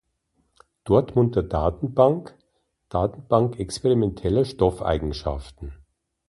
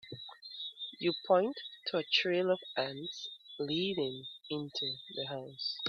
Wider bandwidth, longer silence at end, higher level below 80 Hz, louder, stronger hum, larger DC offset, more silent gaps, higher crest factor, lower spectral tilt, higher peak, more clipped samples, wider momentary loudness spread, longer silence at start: first, 11.5 kHz vs 6.8 kHz; first, 0.55 s vs 0 s; first, -38 dBFS vs -80 dBFS; first, -23 LUFS vs -35 LUFS; neither; neither; neither; about the same, 20 dB vs 22 dB; first, -7.5 dB/octave vs -5 dB/octave; first, -4 dBFS vs -14 dBFS; neither; about the same, 12 LU vs 13 LU; first, 0.85 s vs 0.05 s